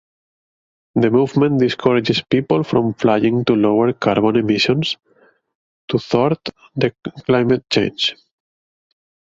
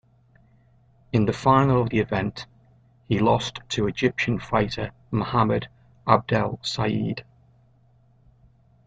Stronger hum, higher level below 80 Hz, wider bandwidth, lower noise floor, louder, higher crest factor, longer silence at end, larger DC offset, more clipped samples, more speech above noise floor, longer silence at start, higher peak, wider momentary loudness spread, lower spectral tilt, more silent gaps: neither; about the same, -52 dBFS vs -50 dBFS; second, 7.8 kHz vs 9 kHz; about the same, -55 dBFS vs -58 dBFS; first, -17 LUFS vs -24 LUFS; second, 16 dB vs 24 dB; second, 1.15 s vs 1.65 s; neither; neither; about the same, 39 dB vs 36 dB; second, 0.95 s vs 1.15 s; about the same, -2 dBFS vs 0 dBFS; second, 8 LU vs 12 LU; about the same, -6.5 dB/octave vs -6.5 dB/octave; first, 5.55-5.88 s vs none